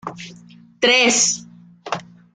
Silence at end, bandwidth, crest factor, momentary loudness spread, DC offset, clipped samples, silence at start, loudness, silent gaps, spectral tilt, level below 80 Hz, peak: 0.3 s; 10.5 kHz; 18 dB; 22 LU; under 0.1%; under 0.1%; 0.05 s; -15 LUFS; none; -0.5 dB/octave; -66 dBFS; -2 dBFS